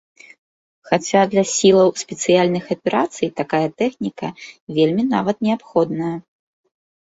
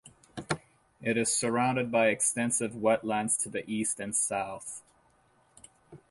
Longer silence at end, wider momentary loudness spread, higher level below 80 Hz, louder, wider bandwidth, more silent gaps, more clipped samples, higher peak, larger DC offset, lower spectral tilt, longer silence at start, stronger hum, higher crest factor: first, 0.8 s vs 0.15 s; about the same, 11 LU vs 12 LU; first, -60 dBFS vs -68 dBFS; first, -18 LUFS vs -29 LUFS; second, 8 kHz vs 12 kHz; first, 4.61-4.67 s vs none; neither; first, -2 dBFS vs -12 dBFS; neither; first, -5 dB/octave vs -3.5 dB/octave; first, 0.85 s vs 0.05 s; neither; about the same, 18 dB vs 18 dB